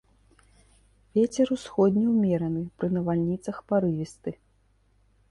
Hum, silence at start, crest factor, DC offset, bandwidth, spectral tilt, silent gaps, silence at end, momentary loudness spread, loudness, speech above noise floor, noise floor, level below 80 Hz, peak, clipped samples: none; 1.15 s; 16 dB; under 0.1%; 11.5 kHz; -8 dB/octave; none; 0.95 s; 10 LU; -26 LUFS; 39 dB; -65 dBFS; -58 dBFS; -10 dBFS; under 0.1%